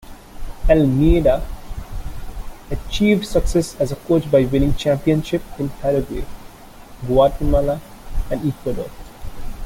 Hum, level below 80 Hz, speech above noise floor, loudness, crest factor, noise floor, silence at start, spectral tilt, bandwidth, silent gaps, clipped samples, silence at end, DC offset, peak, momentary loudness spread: none; -26 dBFS; 22 dB; -19 LUFS; 16 dB; -39 dBFS; 0.05 s; -7 dB/octave; 17 kHz; none; under 0.1%; 0 s; under 0.1%; -2 dBFS; 20 LU